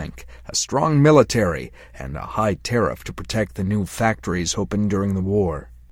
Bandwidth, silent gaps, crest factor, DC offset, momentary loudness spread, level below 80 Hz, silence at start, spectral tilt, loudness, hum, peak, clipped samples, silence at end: 16.5 kHz; none; 20 dB; under 0.1%; 18 LU; -40 dBFS; 0 s; -5.5 dB/octave; -21 LUFS; none; -2 dBFS; under 0.1%; 0.2 s